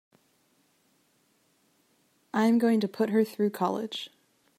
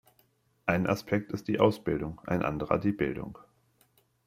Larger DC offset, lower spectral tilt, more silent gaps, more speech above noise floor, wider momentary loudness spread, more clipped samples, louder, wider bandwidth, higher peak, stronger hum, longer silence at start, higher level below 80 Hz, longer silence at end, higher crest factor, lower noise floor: neither; second, -6 dB/octave vs -7.5 dB/octave; neither; about the same, 43 dB vs 40 dB; first, 13 LU vs 8 LU; neither; first, -27 LUFS vs -30 LUFS; about the same, 15.5 kHz vs 16 kHz; second, -12 dBFS vs -8 dBFS; neither; first, 2.35 s vs 0.65 s; second, -82 dBFS vs -56 dBFS; second, 0.5 s vs 0.9 s; second, 18 dB vs 24 dB; about the same, -69 dBFS vs -69 dBFS